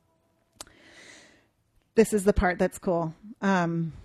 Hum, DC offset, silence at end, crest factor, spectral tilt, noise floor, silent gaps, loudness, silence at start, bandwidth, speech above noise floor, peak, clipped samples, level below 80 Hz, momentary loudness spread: none; under 0.1%; 0.05 s; 20 dB; -6 dB/octave; -69 dBFS; none; -26 LUFS; 1.95 s; 13.5 kHz; 44 dB; -8 dBFS; under 0.1%; -44 dBFS; 23 LU